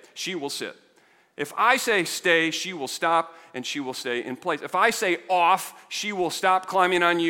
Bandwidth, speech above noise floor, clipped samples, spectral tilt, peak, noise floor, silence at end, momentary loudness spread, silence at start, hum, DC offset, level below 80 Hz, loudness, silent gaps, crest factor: 17 kHz; 36 dB; under 0.1%; -2.5 dB/octave; -4 dBFS; -60 dBFS; 0 s; 11 LU; 0.15 s; none; under 0.1%; -72 dBFS; -24 LUFS; none; 22 dB